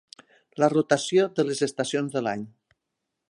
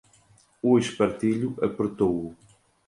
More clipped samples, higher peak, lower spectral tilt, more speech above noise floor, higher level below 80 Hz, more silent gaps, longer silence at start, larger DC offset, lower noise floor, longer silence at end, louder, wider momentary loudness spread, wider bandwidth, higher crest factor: neither; about the same, -8 dBFS vs -8 dBFS; second, -5 dB/octave vs -6.5 dB/octave; first, 58 dB vs 35 dB; second, -74 dBFS vs -58 dBFS; neither; about the same, 0.55 s vs 0.65 s; neither; first, -82 dBFS vs -60 dBFS; first, 0.8 s vs 0.55 s; about the same, -25 LUFS vs -25 LUFS; first, 13 LU vs 7 LU; about the same, 11.5 kHz vs 11.5 kHz; about the same, 18 dB vs 18 dB